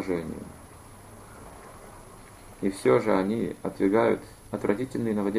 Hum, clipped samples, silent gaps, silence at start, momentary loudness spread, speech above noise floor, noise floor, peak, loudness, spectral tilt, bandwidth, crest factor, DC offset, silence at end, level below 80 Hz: none; under 0.1%; none; 0 s; 25 LU; 22 dB; -47 dBFS; -8 dBFS; -27 LUFS; -7 dB/octave; 14.5 kHz; 20 dB; under 0.1%; 0 s; -54 dBFS